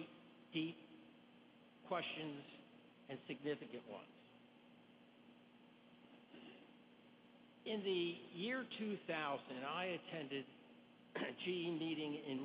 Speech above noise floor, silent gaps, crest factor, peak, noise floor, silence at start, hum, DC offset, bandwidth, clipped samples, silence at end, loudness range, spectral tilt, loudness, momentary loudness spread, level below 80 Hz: 21 dB; none; 18 dB; -30 dBFS; -66 dBFS; 0 s; none; under 0.1%; 5 kHz; under 0.1%; 0 s; 16 LU; -3 dB/octave; -46 LUFS; 23 LU; under -90 dBFS